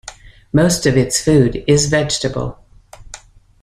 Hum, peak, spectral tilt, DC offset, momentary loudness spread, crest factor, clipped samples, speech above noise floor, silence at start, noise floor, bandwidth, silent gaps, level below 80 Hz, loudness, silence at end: none; -2 dBFS; -4.5 dB/octave; under 0.1%; 18 LU; 16 dB; under 0.1%; 26 dB; 0.05 s; -40 dBFS; 15 kHz; none; -38 dBFS; -15 LUFS; 0.45 s